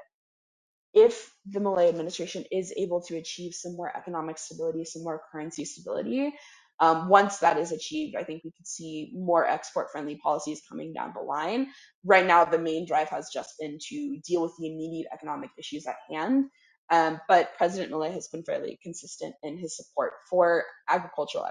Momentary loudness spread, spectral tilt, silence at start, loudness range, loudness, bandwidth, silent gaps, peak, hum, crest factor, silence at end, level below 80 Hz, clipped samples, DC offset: 16 LU; -4.5 dB/octave; 0.95 s; 8 LU; -28 LUFS; 10.5 kHz; 6.74-6.78 s, 11.95-12.02 s, 16.78-16.88 s; -4 dBFS; none; 24 dB; 0 s; -74 dBFS; under 0.1%; under 0.1%